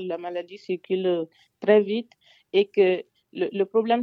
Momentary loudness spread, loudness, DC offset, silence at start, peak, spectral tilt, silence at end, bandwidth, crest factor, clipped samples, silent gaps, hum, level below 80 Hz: 13 LU; -25 LUFS; under 0.1%; 0 s; -6 dBFS; -7.5 dB/octave; 0 s; 5.6 kHz; 18 dB; under 0.1%; none; none; -80 dBFS